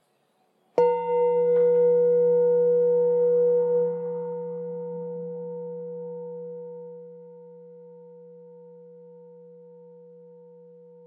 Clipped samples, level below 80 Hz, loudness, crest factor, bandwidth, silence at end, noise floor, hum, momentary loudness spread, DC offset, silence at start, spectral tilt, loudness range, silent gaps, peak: under 0.1%; under -90 dBFS; -23 LUFS; 18 dB; 2.9 kHz; 1.45 s; -68 dBFS; none; 18 LU; under 0.1%; 0.75 s; -10 dB/octave; 20 LU; none; -8 dBFS